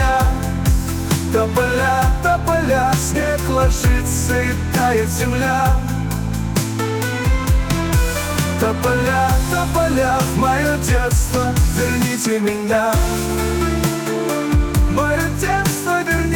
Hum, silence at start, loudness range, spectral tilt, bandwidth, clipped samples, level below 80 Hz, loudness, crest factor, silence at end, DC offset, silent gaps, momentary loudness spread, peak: none; 0 s; 2 LU; -5 dB/octave; 19.5 kHz; under 0.1%; -22 dBFS; -18 LUFS; 12 dB; 0 s; under 0.1%; none; 4 LU; -6 dBFS